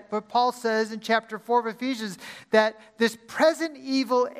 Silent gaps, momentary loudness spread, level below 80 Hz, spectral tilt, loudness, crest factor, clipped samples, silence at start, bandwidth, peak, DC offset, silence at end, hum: none; 8 LU; -76 dBFS; -4 dB/octave; -25 LUFS; 20 dB; under 0.1%; 0.1 s; 15.5 kHz; -6 dBFS; under 0.1%; 0 s; none